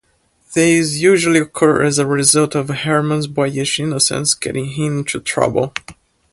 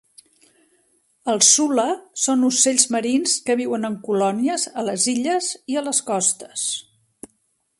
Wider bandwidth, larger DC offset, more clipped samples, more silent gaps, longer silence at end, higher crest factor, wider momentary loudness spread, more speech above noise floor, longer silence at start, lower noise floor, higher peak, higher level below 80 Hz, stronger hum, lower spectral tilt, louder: about the same, 12 kHz vs 11.5 kHz; neither; neither; neither; second, 0.4 s vs 1 s; about the same, 16 dB vs 20 dB; about the same, 8 LU vs 10 LU; second, 43 dB vs 47 dB; second, 0.5 s vs 1.25 s; second, -58 dBFS vs -68 dBFS; about the same, 0 dBFS vs -2 dBFS; first, -50 dBFS vs -70 dBFS; neither; first, -4 dB/octave vs -2 dB/octave; first, -15 LUFS vs -19 LUFS